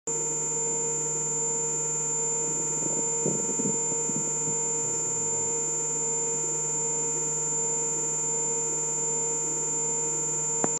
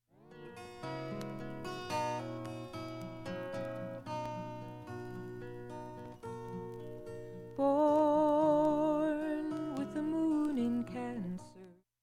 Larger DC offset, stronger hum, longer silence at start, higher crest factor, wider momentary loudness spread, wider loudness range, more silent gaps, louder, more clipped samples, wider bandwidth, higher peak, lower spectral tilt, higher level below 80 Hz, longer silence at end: neither; neither; second, 0.05 s vs 0.25 s; about the same, 20 dB vs 18 dB; second, 1 LU vs 18 LU; second, 0 LU vs 13 LU; neither; first, -25 LUFS vs -36 LUFS; neither; first, 15.5 kHz vs 13.5 kHz; first, -8 dBFS vs -18 dBFS; second, -3 dB/octave vs -7 dB/octave; second, -82 dBFS vs -64 dBFS; second, 0 s vs 0.3 s